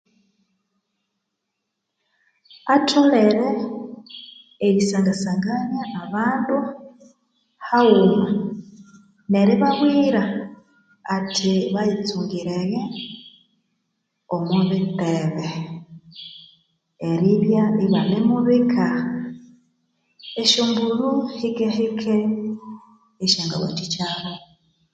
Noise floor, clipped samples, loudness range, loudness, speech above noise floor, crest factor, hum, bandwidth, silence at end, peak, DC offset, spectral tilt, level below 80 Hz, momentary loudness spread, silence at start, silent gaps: -79 dBFS; under 0.1%; 5 LU; -20 LUFS; 59 dB; 20 dB; none; 9.2 kHz; 0.55 s; -2 dBFS; under 0.1%; -5.5 dB/octave; -64 dBFS; 20 LU; 2.65 s; none